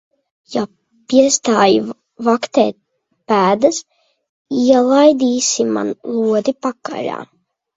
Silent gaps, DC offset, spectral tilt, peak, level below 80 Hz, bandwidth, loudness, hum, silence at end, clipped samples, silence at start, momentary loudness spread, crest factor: 4.29-4.45 s; under 0.1%; -3.5 dB/octave; 0 dBFS; -62 dBFS; 8 kHz; -15 LUFS; none; 0.5 s; under 0.1%; 0.5 s; 13 LU; 16 dB